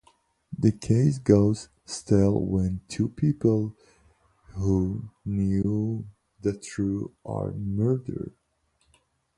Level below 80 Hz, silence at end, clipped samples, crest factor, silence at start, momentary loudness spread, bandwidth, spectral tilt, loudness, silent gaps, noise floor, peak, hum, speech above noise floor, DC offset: -46 dBFS; 1.05 s; under 0.1%; 22 dB; 0.5 s; 14 LU; 11 kHz; -8 dB/octave; -26 LUFS; none; -70 dBFS; -4 dBFS; none; 45 dB; under 0.1%